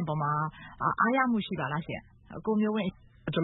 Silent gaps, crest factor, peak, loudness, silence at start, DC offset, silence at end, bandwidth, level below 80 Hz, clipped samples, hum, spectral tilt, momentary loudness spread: none; 18 dB; -12 dBFS; -30 LUFS; 0 s; under 0.1%; 0 s; 4.1 kHz; -58 dBFS; under 0.1%; none; -10.5 dB/octave; 14 LU